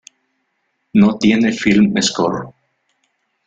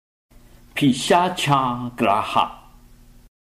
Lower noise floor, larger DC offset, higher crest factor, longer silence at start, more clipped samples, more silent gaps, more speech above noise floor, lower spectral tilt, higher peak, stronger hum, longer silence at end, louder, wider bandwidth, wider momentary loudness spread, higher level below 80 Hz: first, -69 dBFS vs -48 dBFS; neither; about the same, 16 dB vs 16 dB; first, 0.95 s vs 0.75 s; neither; neither; first, 55 dB vs 28 dB; about the same, -5 dB/octave vs -5 dB/octave; first, 0 dBFS vs -6 dBFS; second, none vs 60 Hz at -45 dBFS; about the same, 1 s vs 0.95 s; first, -15 LUFS vs -20 LUFS; second, 9 kHz vs 16 kHz; about the same, 9 LU vs 7 LU; about the same, -52 dBFS vs -50 dBFS